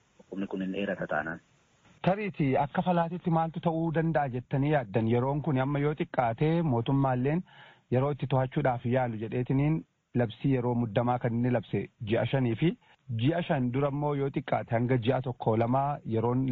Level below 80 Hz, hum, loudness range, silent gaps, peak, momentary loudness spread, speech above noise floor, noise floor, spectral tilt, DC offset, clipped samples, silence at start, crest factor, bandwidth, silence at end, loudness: -56 dBFS; none; 2 LU; none; -12 dBFS; 6 LU; 34 dB; -62 dBFS; -7 dB/octave; under 0.1%; under 0.1%; 0.3 s; 16 dB; 4.4 kHz; 0 s; -29 LUFS